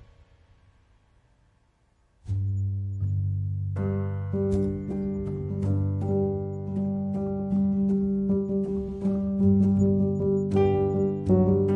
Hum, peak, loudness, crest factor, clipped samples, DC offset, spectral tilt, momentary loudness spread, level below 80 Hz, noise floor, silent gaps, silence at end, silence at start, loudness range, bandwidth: none; -10 dBFS; -26 LUFS; 14 dB; under 0.1%; under 0.1%; -11 dB/octave; 8 LU; -48 dBFS; -65 dBFS; none; 0 s; 2.25 s; 8 LU; 7.4 kHz